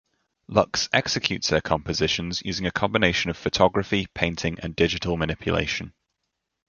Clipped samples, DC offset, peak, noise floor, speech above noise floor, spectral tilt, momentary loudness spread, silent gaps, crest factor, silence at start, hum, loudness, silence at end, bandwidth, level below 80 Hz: under 0.1%; under 0.1%; -2 dBFS; -80 dBFS; 56 dB; -4 dB/octave; 6 LU; none; 24 dB; 0.5 s; none; -24 LUFS; 0.8 s; 7.4 kHz; -44 dBFS